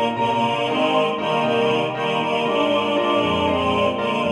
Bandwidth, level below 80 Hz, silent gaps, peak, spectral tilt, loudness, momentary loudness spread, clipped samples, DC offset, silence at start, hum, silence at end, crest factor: 11.5 kHz; -52 dBFS; none; -6 dBFS; -5.5 dB/octave; -20 LUFS; 2 LU; under 0.1%; under 0.1%; 0 s; none; 0 s; 14 dB